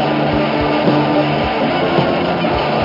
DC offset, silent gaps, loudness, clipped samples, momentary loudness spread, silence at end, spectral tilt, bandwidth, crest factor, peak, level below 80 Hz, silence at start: under 0.1%; none; -15 LUFS; under 0.1%; 2 LU; 0 s; -8 dB/octave; 5.8 kHz; 14 dB; -2 dBFS; -36 dBFS; 0 s